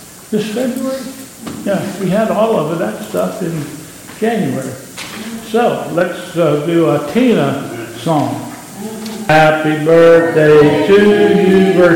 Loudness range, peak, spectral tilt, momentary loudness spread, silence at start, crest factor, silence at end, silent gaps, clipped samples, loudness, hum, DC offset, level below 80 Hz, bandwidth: 8 LU; 0 dBFS; -6 dB/octave; 17 LU; 0 s; 12 dB; 0 s; none; under 0.1%; -13 LUFS; none; under 0.1%; -50 dBFS; 17 kHz